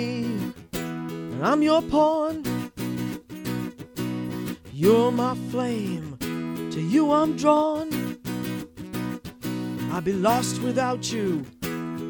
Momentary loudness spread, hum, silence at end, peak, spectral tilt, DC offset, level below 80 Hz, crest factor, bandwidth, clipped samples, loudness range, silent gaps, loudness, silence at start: 12 LU; none; 0 s; -6 dBFS; -6 dB/octave; under 0.1%; -54 dBFS; 20 dB; over 20 kHz; under 0.1%; 3 LU; none; -25 LUFS; 0 s